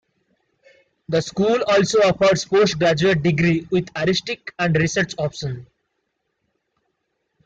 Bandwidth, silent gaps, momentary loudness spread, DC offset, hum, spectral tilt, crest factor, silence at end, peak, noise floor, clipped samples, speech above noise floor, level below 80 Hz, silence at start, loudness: 9 kHz; none; 9 LU; under 0.1%; none; -5 dB/octave; 14 dB; 1.8 s; -6 dBFS; -74 dBFS; under 0.1%; 55 dB; -52 dBFS; 1.1 s; -19 LUFS